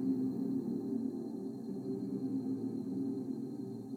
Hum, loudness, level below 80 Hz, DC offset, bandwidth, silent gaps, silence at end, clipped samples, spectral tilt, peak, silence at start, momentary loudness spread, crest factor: none; -39 LUFS; -86 dBFS; under 0.1%; 9.8 kHz; none; 0 s; under 0.1%; -9.5 dB/octave; -24 dBFS; 0 s; 6 LU; 14 dB